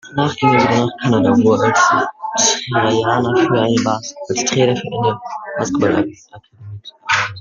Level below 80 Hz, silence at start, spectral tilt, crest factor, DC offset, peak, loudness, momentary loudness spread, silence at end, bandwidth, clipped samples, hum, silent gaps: -54 dBFS; 0.05 s; -4 dB/octave; 14 dB; under 0.1%; 0 dBFS; -16 LUFS; 11 LU; 0 s; 9.4 kHz; under 0.1%; none; none